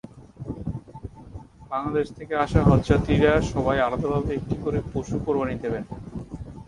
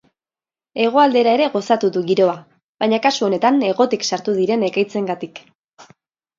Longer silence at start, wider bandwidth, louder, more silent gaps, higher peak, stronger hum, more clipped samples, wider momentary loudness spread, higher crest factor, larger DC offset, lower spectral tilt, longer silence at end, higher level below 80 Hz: second, 0.05 s vs 0.75 s; first, 11 kHz vs 7.6 kHz; second, -24 LUFS vs -17 LUFS; second, none vs 2.63-2.75 s, 5.55-5.68 s; about the same, -4 dBFS vs -2 dBFS; neither; neither; first, 21 LU vs 10 LU; about the same, 20 dB vs 18 dB; neither; first, -7.5 dB/octave vs -4.5 dB/octave; second, 0.05 s vs 0.55 s; first, -36 dBFS vs -70 dBFS